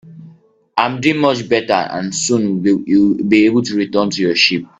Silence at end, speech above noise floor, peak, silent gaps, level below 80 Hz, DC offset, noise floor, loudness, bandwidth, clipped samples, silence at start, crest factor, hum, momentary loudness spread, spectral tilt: 0.15 s; 32 dB; 0 dBFS; none; -54 dBFS; under 0.1%; -46 dBFS; -15 LUFS; 8.4 kHz; under 0.1%; 0.05 s; 16 dB; none; 6 LU; -4 dB/octave